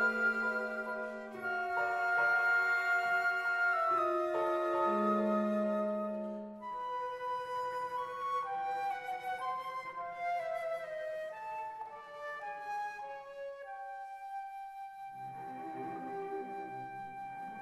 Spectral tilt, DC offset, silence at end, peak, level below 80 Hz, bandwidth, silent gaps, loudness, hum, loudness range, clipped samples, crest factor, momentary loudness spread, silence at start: -5.5 dB/octave; under 0.1%; 0 s; -20 dBFS; -78 dBFS; 15.5 kHz; none; -36 LUFS; none; 13 LU; under 0.1%; 14 dB; 15 LU; 0 s